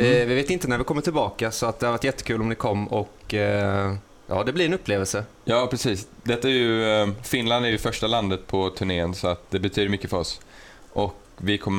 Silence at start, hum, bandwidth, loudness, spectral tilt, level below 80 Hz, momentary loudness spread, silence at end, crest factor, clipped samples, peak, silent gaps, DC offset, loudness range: 0 s; none; 18 kHz; -24 LUFS; -5 dB/octave; -46 dBFS; 8 LU; 0 s; 18 dB; under 0.1%; -6 dBFS; none; under 0.1%; 3 LU